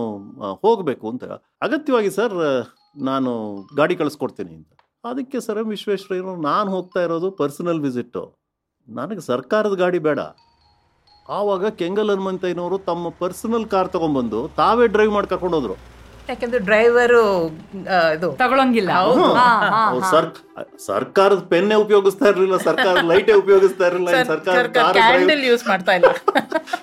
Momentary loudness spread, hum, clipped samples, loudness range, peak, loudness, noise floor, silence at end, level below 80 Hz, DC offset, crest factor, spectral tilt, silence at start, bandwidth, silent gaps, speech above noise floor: 15 LU; none; under 0.1%; 9 LU; -2 dBFS; -18 LUFS; -59 dBFS; 0 s; -54 dBFS; under 0.1%; 16 dB; -5 dB/octave; 0 s; 15 kHz; none; 41 dB